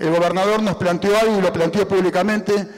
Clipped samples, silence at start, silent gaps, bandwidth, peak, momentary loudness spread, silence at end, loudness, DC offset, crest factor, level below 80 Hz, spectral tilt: under 0.1%; 0 s; none; 16 kHz; -12 dBFS; 3 LU; 0 s; -18 LUFS; under 0.1%; 6 dB; -52 dBFS; -5.5 dB/octave